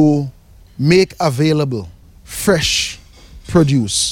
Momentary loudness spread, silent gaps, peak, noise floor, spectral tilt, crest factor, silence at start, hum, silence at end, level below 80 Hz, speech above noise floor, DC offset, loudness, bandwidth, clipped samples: 15 LU; none; -2 dBFS; -39 dBFS; -4.5 dB/octave; 14 dB; 0 s; none; 0 s; -38 dBFS; 25 dB; under 0.1%; -15 LUFS; 17 kHz; under 0.1%